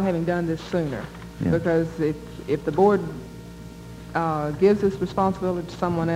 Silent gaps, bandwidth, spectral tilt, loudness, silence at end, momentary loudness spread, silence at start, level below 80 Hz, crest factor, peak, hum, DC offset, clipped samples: none; 15.5 kHz; -8 dB/octave; -24 LUFS; 0 s; 19 LU; 0 s; -46 dBFS; 18 dB; -6 dBFS; none; under 0.1%; under 0.1%